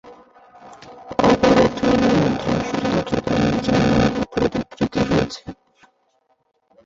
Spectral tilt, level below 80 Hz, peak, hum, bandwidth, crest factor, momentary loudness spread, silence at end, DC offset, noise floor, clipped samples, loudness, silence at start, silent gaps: -6.5 dB/octave; -40 dBFS; -2 dBFS; none; 7.8 kHz; 18 dB; 8 LU; 1.3 s; under 0.1%; -66 dBFS; under 0.1%; -19 LUFS; 0.05 s; none